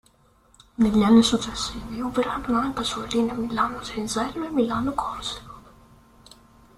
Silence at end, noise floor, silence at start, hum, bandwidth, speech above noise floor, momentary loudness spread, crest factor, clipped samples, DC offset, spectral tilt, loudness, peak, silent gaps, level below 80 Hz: 1.15 s; -59 dBFS; 0.8 s; none; 13.5 kHz; 36 dB; 14 LU; 20 dB; under 0.1%; under 0.1%; -4.5 dB/octave; -24 LUFS; -6 dBFS; none; -46 dBFS